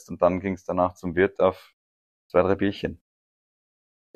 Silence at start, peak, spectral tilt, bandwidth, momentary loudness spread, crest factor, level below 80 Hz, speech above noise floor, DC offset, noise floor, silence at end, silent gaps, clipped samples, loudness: 0.1 s; -6 dBFS; -7.5 dB/octave; 9 kHz; 10 LU; 22 dB; -54 dBFS; over 66 dB; under 0.1%; under -90 dBFS; 1.2 s; 1.73-2.30 s; under 0.1%; -25 LUFS